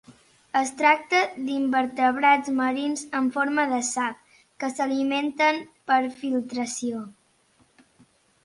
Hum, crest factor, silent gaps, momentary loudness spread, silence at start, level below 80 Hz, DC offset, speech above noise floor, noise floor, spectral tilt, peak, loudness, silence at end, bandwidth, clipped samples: none; 20 dB; none; 10 LU; 0.1 s; -72 dBFS; under 0.1%; 39 dB; -63 dBFS; -2.5 dB/octave; -6 dBFS; -24 LUFS; 1.35 s; 11.5 kHz; under 0.1%